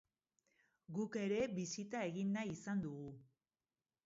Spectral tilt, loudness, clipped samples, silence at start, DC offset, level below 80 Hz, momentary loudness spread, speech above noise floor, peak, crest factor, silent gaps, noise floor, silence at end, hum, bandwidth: -6 dB/octave; -43 LUFS; under 0.1%; 0.9 s; under 0.1%; -76 dBFS; 11 LU; over 48 dB; -28 dBFS; 16 dB; none; under -90 dBFS; 0.8 s; none; 7.6 kHz